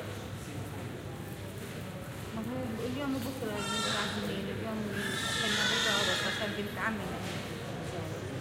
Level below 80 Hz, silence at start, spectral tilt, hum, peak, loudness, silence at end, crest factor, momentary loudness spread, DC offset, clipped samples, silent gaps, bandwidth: -56 dBFS; 0 s; -3.5 dB/octave; none; -18 dBFS; -34 LUFS; 0 s; 18 dB; 14 LU; under 0.1%; under 0.1%; none; 16.5 kHz